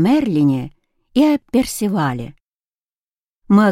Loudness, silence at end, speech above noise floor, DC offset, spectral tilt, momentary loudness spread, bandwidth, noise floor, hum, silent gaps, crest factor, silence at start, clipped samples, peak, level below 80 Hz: -17 LUFS; 0 s; over 74 dB; under 0.1%; -6.5 dB/octave; 12 LU; 16 kHz; under -90 dBFS; none; 2.43-3.42 s; 16 dB; 0 s; under 0.1%; -2 dBFS; -48 dBFS